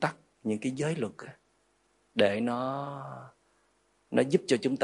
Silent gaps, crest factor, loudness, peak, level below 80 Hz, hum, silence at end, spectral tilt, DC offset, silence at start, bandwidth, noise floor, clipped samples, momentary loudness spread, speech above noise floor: none; 24 dB; -31 LUFS; -8 dBFS; -76 dBFS; 50 Hz at -65 dBFS; 0 s; -5.5 dB/octave; under 0.1%; 0 s; 11.5 kHz; -71 dBFS; under 0.1%; 17 LU; 41 dB